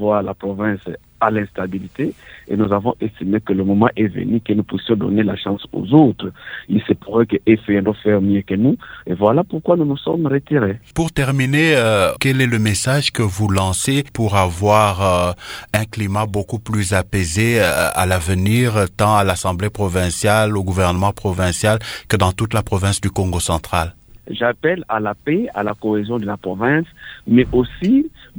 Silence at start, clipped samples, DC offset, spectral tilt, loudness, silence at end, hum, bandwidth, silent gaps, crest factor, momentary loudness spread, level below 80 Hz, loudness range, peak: 0 s; under 0.1%; under 0.1%; -5.5 dB/octave; -17 LUFS; 0 s; none; over 20 kHz; none; 18 dB; 8 LU; -40 dBFS; 4 LU; 0 dBFS